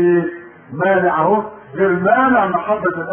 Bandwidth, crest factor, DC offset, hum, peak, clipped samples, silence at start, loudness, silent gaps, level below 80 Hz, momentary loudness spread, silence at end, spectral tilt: 3.4 kHz; 14 dB; under 0.1%; none; -2 dBFS; under 0.1%; 0 s; -16 LUFS; none; -54 dBFS; 14 LU; 0 s; -12.5 dB/octave